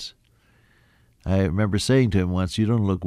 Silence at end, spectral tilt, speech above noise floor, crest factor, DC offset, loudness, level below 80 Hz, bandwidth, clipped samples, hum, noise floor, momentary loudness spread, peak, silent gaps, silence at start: 0 s; -6.5 dB/octave; 39 dB; 16 dB; under 0.1%; -22 LUFS; -44 dBFS; 12.5 kHz; under 0.1%; none; -60 dBFS; 8 LU; -8 dBFS; none; 0 s